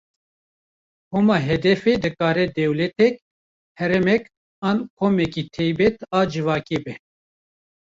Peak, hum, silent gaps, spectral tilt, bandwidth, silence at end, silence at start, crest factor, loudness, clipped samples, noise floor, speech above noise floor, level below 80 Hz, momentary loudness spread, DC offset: -6 dBFS; none; 3.22-3.75 s, 4.37-4.62 s, 4.90-4.97 s; -7 dB/octave; 7.6 kHz; 1 s; 1.1 s; 16 dB; -21 LUFS; under 0.1%; under -90 dBFS; over 70 dB; -52 dBFS; 9 LU; under 0.1%